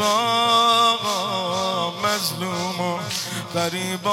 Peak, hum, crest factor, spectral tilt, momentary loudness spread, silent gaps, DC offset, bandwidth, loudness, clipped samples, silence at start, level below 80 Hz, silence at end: -8 dBFS; none; 14 dB; -3 dB/octave; 9 LU; none; under 0.1%; 16.5 kHz; -21 LUFS; under 0.1%; 0 s; -64 dBFS; 0 s